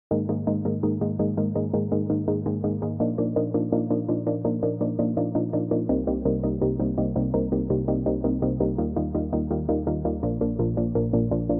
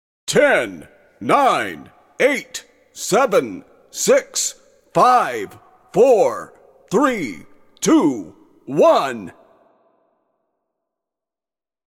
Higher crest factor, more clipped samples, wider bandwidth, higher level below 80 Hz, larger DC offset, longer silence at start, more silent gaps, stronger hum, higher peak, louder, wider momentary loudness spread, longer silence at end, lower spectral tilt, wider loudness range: about the same, 16 dB vs 18 dB; neither; second, 2 kHz vs 16.5 kHz; first, -40 dBFS vs -62 dBFS; neither; second, 0.1 s vs 0.25 s; neither; neither; second, -8 dBFS vs -2 dBFS; second, -25 LUFS vs -17 LUFS; second, 2 LU vs 18 LU; second, 0 s vs 2.65 s; first, -15.5 dB/octave vs -3.5 dB/octave; second, 1 LU vs 4 LU